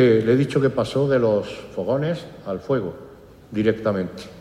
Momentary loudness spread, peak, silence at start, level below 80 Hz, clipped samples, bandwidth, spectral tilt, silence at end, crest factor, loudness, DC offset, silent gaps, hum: 13 LU; -6 dBFS; 0 s; -54 dBFS; under 0.1%; 12.5 kHz; -7.5 dB/octave; 0 s; 16 dB; -22 LUFS; under 0.1%; none; none